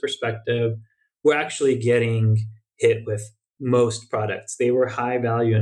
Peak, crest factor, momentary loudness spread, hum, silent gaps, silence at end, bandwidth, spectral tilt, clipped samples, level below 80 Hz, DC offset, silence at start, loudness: -6 dBFS; 16 dB; 10 LU; none; none; 0 s; 11 kHz; -6 dB/octave; under 0.1%; -66 dBFS; under 0.1%; 0.05 s; -22 LUFS